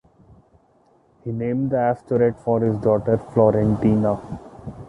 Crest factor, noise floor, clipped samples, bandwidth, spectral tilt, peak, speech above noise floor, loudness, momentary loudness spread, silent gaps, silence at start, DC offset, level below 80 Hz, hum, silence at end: 18 dB; -58 dBFS; under 0.1%; 8.2 kHz; -10.5 dB/octave; -2 dBFS; 39 dB; -20 LUFS; 16 LU; none; 1.25 s; under 0.1%; -46 dBFS; none; 0 s